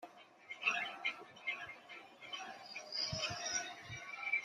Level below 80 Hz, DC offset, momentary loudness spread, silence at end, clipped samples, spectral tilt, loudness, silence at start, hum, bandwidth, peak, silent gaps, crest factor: -74 dBFS; under 0.1%; 16 LU; 0 s; under 0.1%; -1 dB/octave; -41 LUFS; 0 s; none; 14 kHz; -20 dBFS; none; 24 dB